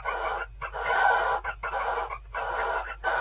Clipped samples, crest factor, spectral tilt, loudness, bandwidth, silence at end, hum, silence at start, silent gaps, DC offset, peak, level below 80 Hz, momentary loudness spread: under 0.1%; 18 dB; -0.5 dB/octave; -29 LUFS; 4 kHz; 0 s; none; 0 s; none; under 0.1%; -10 dBFS; -46 dBFS; 11 LU